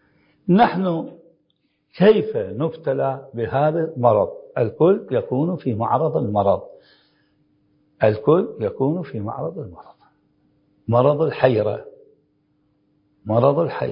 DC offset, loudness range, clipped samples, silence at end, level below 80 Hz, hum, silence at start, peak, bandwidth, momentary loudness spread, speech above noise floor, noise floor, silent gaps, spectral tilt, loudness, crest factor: under 0.1%; 3 LU; under 0.1%; 0 s; -54 dBFS; none; 0.45 s; 0 dBFS; 5.4 kHz; 12 LU; 49 dB; -68 dBFS; none; -12.5 dB/octave; -20 LUFS; 20 dB